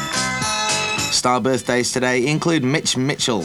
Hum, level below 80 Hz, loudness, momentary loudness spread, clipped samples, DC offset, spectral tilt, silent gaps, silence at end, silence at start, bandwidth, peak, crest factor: none; -50 dBFS; -18 LUFS; 2 LU; under 0.1%; under 0.1%; -3.5 dB/octave; none; 0 s; 0 s; 19 kHz; -4 dBFS; 16 dB